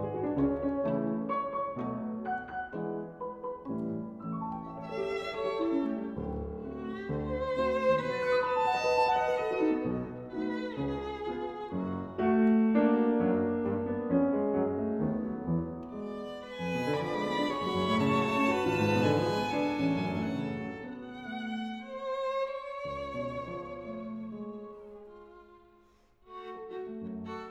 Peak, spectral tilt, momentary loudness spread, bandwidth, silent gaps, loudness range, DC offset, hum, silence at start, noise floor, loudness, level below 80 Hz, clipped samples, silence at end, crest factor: -14 dBFS; -7 dB/octave; 13 LU; 11.5 kHz; none; 9 LU; under 0.1%; none; 0 s; -63 dBFS; -32 LUFS; -56 dBFS; under 0.1%; 0 s; 18 dB